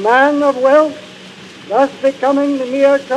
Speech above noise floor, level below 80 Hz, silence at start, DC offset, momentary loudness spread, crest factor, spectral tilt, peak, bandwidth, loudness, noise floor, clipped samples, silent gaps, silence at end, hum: 23 dB; -66 dBFS; 0 s; under 0.1%; 23 LU; 14 dB; -4.5 dB/octave; 0 dBFS; 10.5 kHz; -13 LUFS; -35 dBFS; under 0.1%; none; 0 s; none